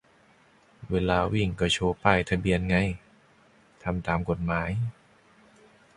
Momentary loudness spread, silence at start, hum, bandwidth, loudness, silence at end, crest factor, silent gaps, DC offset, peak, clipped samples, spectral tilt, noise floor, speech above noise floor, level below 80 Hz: 9 LU; 0.8 s; none; 11.5 kHz; -27 LUFS; 1.05 s; 24 dB; none; under 0.1%; -4 dBFS; under 0.1%; -6 dB/octave; -60 dBFS; 34 dB; -44 dBFS